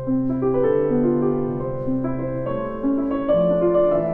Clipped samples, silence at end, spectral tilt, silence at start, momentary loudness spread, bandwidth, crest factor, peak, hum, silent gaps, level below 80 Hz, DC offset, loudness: under 0.1%; 0 s; -11.5 dB/octave; 0 s; 8 LU; 3.6 kHz; 12 dB; -8 dBFS; none; none; -42 dBFS; under 0.1%; -21 LUFS